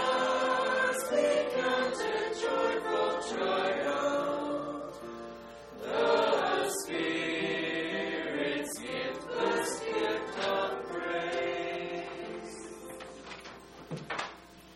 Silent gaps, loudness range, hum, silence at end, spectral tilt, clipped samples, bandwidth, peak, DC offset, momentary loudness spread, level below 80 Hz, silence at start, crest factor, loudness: none; 6 LU; none; 0 s; -3 dB/octave; under 0.1%; 15.5 kHz; -14 dBFS; under 0.1%; 16 LU; -66 dBFS; 0 s; 18 dB; -31 LUFS